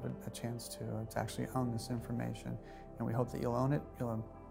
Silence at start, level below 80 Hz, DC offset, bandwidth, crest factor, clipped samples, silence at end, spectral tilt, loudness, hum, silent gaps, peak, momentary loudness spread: 0 s; -58 dBFS; under 0.1%; 16.5 kHz; 20 dB; under 0.1%; 0 s; -6.5 dB/octave; -39 LUFS; none; none; -20 dBFS; 8 LU